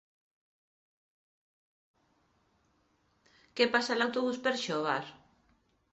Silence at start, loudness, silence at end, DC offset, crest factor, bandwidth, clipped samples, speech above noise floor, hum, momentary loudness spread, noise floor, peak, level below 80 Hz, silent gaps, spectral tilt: 3.55 s; -31 LUFS; 0.8 s; under 0.1%; 24 dB; 8 kHz; under 0.1%; 42 dB; none; 10 LU; -73 dBFS; -12 dBFS; -78 dBFS; none; -1.5 dB/octave